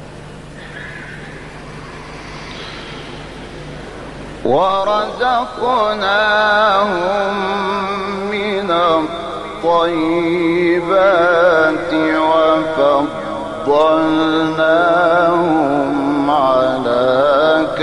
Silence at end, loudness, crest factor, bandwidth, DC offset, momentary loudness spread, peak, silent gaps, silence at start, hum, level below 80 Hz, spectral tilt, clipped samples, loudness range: 0 s; -14 LUFS; 14 dB; 11.5 kHz; under 0.1%; 19 LU; -2 dBFS; none; 0 s; 50 Hz at -45 dBFS; -44 dBFS; -5.5 dB/octave; under 0.1%; 15 LU